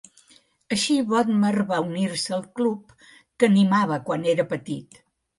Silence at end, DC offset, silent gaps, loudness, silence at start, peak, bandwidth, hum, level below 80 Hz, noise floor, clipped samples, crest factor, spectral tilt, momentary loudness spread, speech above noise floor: 0.55 s; under 0.1%; none; -23 LUFS; 0.7 s; -6 dBFS; 11.5 kHz; none; -68 dBFS; -58 dBFS; under 0.1%; 18 dB; -5.5 dB/octave; 10 LU; 36 dB